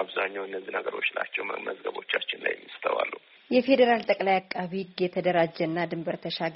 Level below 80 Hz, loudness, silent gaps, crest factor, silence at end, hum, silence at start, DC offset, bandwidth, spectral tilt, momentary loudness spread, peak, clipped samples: -72 dBFS; -28 LUFS; none; 20 dB; 0 s; none; 0 s; under 0.1%; 5.8 kHz; -3 dB/octave; 11 LU; -8 dBFS; under 0.1%